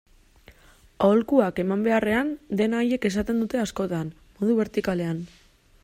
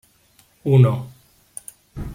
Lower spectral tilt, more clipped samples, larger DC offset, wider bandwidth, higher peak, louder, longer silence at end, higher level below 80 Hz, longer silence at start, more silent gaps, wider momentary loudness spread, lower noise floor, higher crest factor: second, -6.5 dB/octave vs -8 dB/octave; neither; neither; about the same, 15.5 kHz vs 14.5 kHz; about the same, -6 dBFS vs -4 dBFS; second, -24 LUFS vs -18 LUFS; first, 0.55 s vs 0 s; second, -52 dBFS vs -44 dBFS; first, 1 s vs 0.65 s; neither; second, 9 LU vs 23 LU; about the same, -54 dBFS vs -57 dBFS; about the same, 18 dB vs 18 dB